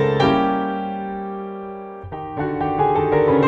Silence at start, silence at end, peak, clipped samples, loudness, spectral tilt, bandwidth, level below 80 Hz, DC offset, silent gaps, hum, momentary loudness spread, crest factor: 0 s; 0 s; -6 dBFS; under 0.1%; -21 LUFS; -8 dB/octave; 7 kHz; -46 dBFS; under 0.1%; none; none; 15 LU; 14 dB